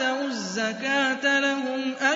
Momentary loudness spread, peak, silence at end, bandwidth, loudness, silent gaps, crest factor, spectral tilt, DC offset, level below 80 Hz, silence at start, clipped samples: 7 LU; -10 dBFS; 0 s; 7.8 kHz; -24 LUFS; none; 16 dB; -2.5 dB/octave; under 0.1%; -78 dBFS; 0 s; under 0.1%